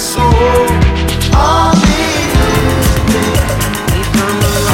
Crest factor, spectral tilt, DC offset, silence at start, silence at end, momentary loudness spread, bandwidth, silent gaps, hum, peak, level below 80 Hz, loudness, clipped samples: 10 dB; -5 dB/octave; under 0.1%; 0 s; 0 s; 5 LU; 17 kHz; none; none; 0 dBFS; -16 dBFS; -11 LUFS; under 0.1%